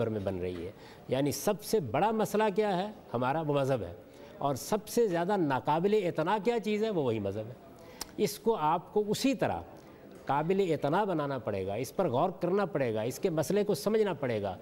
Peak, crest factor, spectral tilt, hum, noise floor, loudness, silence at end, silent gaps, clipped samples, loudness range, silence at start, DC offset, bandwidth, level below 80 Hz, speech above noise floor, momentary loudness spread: -18 dBFS; 14 dB; -5.5 dB/octave; none; -51 dBFS; -31 LUFS; 0 s; none; under 0.1%; 2 LU; 0 s; under 0.1%; 16 kHz; -64 dBFS; 21 dB; 11 LU